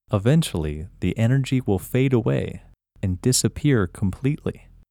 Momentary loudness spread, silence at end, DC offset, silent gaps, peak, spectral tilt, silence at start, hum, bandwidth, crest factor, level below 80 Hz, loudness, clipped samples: 10 LU; 0.35 s; under 0.1%; none; -6 dBFS; -6 dB/octave; 0.1 s; none; 17.5 kHz; 16 dB; -42 dBFS; -23 LUFS; under 0.1%